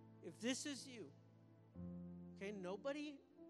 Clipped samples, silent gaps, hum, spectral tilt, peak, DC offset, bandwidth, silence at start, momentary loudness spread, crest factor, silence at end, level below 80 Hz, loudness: under 0.1%; none; none; -4 dB/octave; -32 dBFS; under 0.1%; 13 kHz; 0 s; 18 LU; 20 dB; 0 s; -80 dBFS; -50 LUFS